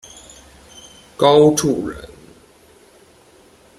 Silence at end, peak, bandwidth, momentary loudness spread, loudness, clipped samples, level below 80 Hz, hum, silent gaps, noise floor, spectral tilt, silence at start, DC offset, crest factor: 1.7 s; -2 dBFS; 15 kHz; 28 LU; -15 LUFS; under 0.1%; -50 dBFS; none; none; -49 dBFS; -5 dB/octave; 1.2 s; under 0.1%; 18 dB